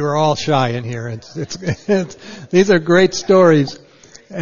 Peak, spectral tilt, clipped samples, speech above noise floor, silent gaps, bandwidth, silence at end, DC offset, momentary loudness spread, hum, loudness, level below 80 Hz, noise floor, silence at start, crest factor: 0 dBFS; -5.5 dB/octave; under 0.1%; 26 dB; none; 7.4 kHz; 0 s; 0.9%; 16 LU; none; -15 LUFS; -52 dBFS; -42 dBFS; 0 s; 16 dB